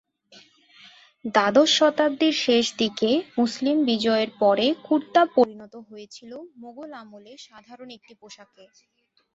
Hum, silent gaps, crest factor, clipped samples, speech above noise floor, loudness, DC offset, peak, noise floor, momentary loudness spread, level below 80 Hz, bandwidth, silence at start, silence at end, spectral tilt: none; none; 20 dB; under 0.1%; 31 dB; -21 LUFS; under 0.1%; -4 dBFS; -54 dBFS; 24 LU; -70 dBFS; 8 kHz; 1.25 s; 1 s; -3.5 dB/octave